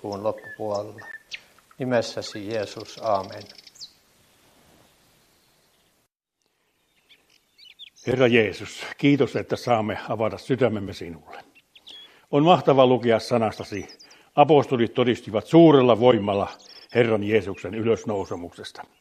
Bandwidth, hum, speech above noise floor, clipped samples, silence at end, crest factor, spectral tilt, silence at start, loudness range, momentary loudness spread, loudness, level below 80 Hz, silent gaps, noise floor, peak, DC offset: 14 kHz; none; 53 dB; under 0.1%; 0.2 s; 20 dB; -6.5 dB/octave; 0.05 s; 11 LU; 22 LU; -22 LUFS; -66 dBFS; none; -75 dBFS; -4 dBFS; under 0.1%